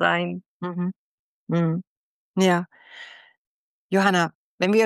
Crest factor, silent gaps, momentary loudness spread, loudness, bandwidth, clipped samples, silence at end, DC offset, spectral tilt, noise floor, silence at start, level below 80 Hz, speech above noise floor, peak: 18 dB; 0.46-0.60 s, 0.96-1.47 s, 1.87-2.34 s, 3.38-3.89 s, 4.35-4.58 s; 20 LU; -24 LUFS; 12.5 kHz; under 0.1%; 0 s; under 0.1%; -6 dB/octave; -45 dBFS; 0 s; -74 dBFS; 23 dB; -8 dBFS